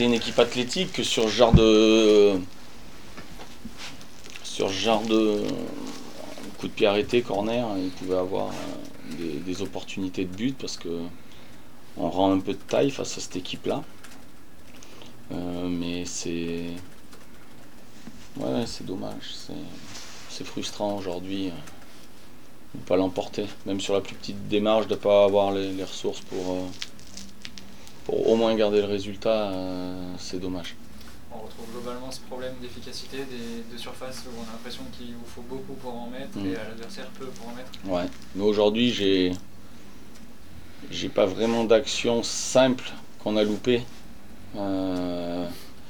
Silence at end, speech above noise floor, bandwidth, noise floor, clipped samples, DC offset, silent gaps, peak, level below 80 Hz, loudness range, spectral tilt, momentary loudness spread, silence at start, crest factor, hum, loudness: 0 s; 25 dB; 20 kHz; -50 dBFS; under 0.1%; 2%; none; -2 dBFS; -46 dBFS; 12 LU; -5 dB/octave; 21 LU; 0 s; 24 dB; none; -26 LUFS